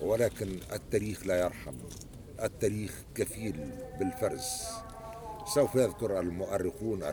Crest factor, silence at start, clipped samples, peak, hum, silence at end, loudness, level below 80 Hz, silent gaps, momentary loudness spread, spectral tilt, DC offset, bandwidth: 18 dB; 0 s; under 0.1%; -14 dBFS; none; 0 s; -33 LUFS; -52 dBFS; none; 14 LU; -5 dB/octave; under 0.1%; over 20 kHz